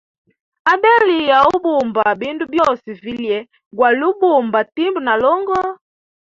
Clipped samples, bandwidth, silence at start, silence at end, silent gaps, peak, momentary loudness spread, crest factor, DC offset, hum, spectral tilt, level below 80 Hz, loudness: under 0.1%; 7.6 kHz; 0.65 s; 0.65 s; 3.66-3.71 s; -2 dBFS; 11 LU; 14 dB; under 0.1%; none; -5 dB/octave; -56 dBFS; -15 LUFS